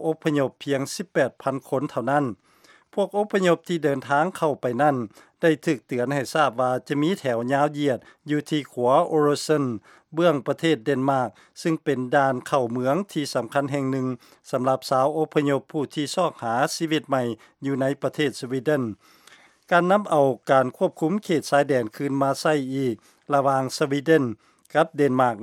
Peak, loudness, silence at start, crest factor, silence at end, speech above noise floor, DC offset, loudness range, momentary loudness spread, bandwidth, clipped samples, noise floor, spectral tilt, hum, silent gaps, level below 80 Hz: -4 dBFS; -24 LUFS; 0 s; 18 dB; 0 s; 31 dB; under 0.1%; 3 LU; 8 LU; 16 kHz; under 0.1%; -54 dBFS; -5.5 dB/octave; none; none; -74 dBFS